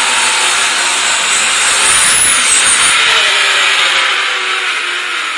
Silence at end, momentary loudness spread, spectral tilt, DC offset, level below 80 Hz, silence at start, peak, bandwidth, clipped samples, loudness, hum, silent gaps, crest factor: 0 s; 7 LU; 2 dB/octave; under 0.1%; -48 dBFS; 0 s; 0 dBFS; 12 kHz; under 0.1%; -8 LUFS; none; none; 12 dB